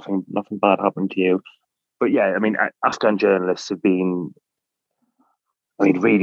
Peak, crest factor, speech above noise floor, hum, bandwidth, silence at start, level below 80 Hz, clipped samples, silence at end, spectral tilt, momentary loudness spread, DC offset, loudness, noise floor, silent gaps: -2 dBFS; 20 dB; 63 dB; none; 7.6 kHz; 0.05 s; -76 dBFS; under 0.1%; 0 s; -6.5 dB/octave; 7 LU; under 0.1%; -20 LUFS; -82 dBFS; none